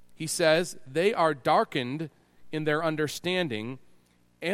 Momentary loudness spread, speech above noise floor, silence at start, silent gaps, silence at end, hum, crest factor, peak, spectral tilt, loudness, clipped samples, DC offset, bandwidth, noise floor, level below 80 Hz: 14 LU; 35 dB; 0 s; none; 0 s; 60 Hz at -60 dBFS; 20 dB; -8 dBFS; -4.5 dB/octave; -27 LUFS; under 0.1%; under 0.1%; 16.5 kHz; -62 dBFS; -68 dBFS